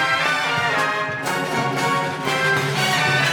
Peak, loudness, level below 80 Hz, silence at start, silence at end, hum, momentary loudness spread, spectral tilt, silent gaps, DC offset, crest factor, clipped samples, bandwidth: -6 dBFS; -20 LUFS; -58 dBFS; 0 s; 0 s; none; 5 LU; -3.5 dB/octave; none; under 0.1%; 14 dB; under 0.1%; 19 kHz